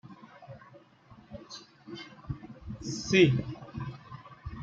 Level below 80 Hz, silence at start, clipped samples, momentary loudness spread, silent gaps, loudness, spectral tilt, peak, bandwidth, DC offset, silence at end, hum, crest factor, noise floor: -56 dBFS; 0.05 s; under 0.1%; 27 LU; none; -29 LUFS; -5.5 dB/octave; -10 dBFS; 7.8 kHz; under 0.1%; 0 s; none; 22 dB; -56 dBFS